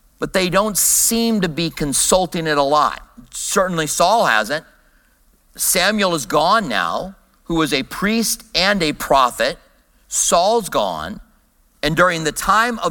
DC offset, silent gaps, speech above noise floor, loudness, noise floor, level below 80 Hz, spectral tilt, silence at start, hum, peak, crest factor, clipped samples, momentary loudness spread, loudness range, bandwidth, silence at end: under 0.1%; none; 39 dB; -17 LUFS; -56 dBFS; -42 dBFS; -2.5 dB/octave; 0.2 s; none; 0 dBFS; 18 dB; under 0.1%; 9 LU; 2 LU; 17.5 kHz; 0 s